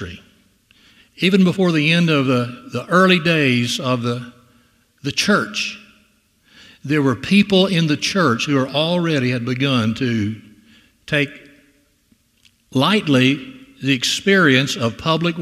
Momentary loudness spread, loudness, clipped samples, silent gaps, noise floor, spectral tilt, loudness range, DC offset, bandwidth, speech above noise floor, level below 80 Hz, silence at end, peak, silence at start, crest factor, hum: 12 LU; -17 LUFS; under 0.1%; none; -59 dBFS; -5 dB/octave; 6 LU; under 0.1%; 14.5 kHz; 42 dB; -56 dBFS; 0 s; 0 dBFS; 0 s; 18 dB; none